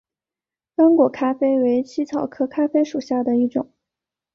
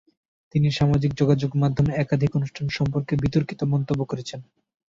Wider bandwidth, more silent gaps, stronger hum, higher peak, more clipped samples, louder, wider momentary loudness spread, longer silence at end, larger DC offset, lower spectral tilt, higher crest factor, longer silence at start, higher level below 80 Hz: about the same, 7 kHz vs 7.6 kHz; neither; neither; about the same, -4 dBFS vs -6 dBFS; neither; first, -20 LUFS vs -23 LUFS; about the same, 9 LU vs 7 LU; first, 0.7 s vs 0.45 s; neither; about the same, -6.5 dB/octave vs -7.5 dB/octave; about the same, 16 dB vs 16 dB; first, 0.8 s vs 0.55 s; second, -66 dBFS vs -46 dBFS